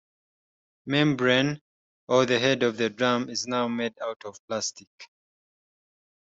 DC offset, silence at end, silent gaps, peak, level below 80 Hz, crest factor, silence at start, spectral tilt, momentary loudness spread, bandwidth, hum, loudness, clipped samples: under 0.1%; 1.25 s; 1.61-2.07 s, 4.16-4.20 s, 4.39-4.48 s, 4.87-4.98 s; -8 dBFS; -68 dBFS; 20 dB; 0.85 s; -4.5 dB/octave; 13 LU; 8 kHz; none; -25 LUFS; under 0.1%